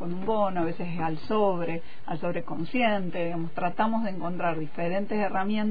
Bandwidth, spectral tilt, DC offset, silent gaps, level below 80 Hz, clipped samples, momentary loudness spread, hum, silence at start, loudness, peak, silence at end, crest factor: 5 kHz; -9.5 dB/octave; 4%; none; -58 dBFS; under 0.1%; 6 LU; none; 0 s; -29 LUFS; -12 dBFS; 0 s; 16 dB